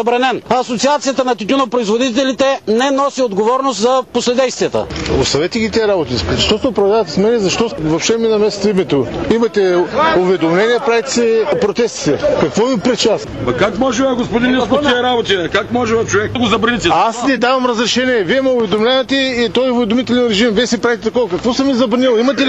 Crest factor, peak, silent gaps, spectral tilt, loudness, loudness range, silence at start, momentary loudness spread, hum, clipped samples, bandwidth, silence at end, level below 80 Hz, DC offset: 12 dB; 0 dBFS; none; -4.5 dB/octave; -14 LUFS; 1 LU; 0 s; 3 LU; none; under 0.1%; 8.6 kHz; 0 s; -38 dBFS; 0.2%